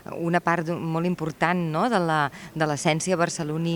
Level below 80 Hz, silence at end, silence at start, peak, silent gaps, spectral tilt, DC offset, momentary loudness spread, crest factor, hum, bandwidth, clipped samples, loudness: -60 dBFS; 0 s; 0.1 s; -6 dBFS; none; -5 dB/octave; under 0.1%; 5 LU; 18 dB; none; 19 kHz; under 0.1%; -25 LUFS